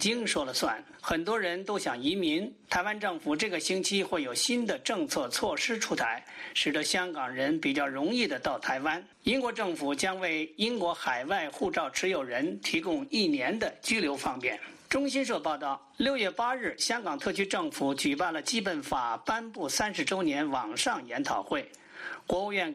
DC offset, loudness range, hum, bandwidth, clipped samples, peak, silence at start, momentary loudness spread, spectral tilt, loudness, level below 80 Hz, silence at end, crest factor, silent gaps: under 0.1%; 1 LU; none; 15 kHz; under 0.1%; -14 dBFS; 0 s; 5 LU; -2.5 dB/octave; -30 LUFS; -62 dBFS; 0 s; 18 dB; none